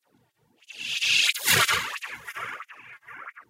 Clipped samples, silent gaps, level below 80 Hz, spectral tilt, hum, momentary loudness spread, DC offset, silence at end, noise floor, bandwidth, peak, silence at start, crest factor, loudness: under 0.1%; none; -64 dBFS; 0 dB/octave; none; 24 LU; under 0.1%; 0.1 s; -67 dBFS; 16 kHz; -8 dBFS; 0.7 s; 20 dB; -23 LUFS